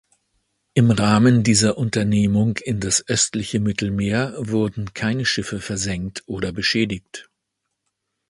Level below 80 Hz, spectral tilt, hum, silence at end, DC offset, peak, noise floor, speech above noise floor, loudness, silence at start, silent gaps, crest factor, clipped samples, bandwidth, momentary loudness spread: -46 dBFS; -4.5 dB/octave; none; 1.05 s; under 0.1%; -2 dBFS; -78 dBFS; 58 dB; -20 LUFS; 0.75 s; none; 20 dB; under 0.1%; 11.5 kHz; 11 LU